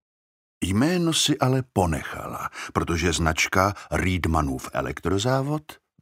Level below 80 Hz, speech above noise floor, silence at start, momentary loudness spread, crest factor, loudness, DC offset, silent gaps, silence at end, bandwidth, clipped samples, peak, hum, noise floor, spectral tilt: -40 dBFS; over 66 dB; 0.6 s; 11 LU; 20 dB; -24 LUFS; under 0.1%; none; 0.25 s; 16 kHz; under 0.1%; -4 dBFS; none; under -90 dBFS; -4.5 dB/octave